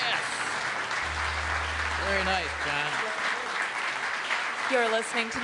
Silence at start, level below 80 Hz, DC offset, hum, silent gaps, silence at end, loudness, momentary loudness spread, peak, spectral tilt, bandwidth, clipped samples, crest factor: 0 s; -48 dBFS; under 0.1%; none; none; 0 s; -28 LUFS; 4 LU; -12 dBFS; -2.5 dB/octave; 11 kHz; under 0.1%; 16 dB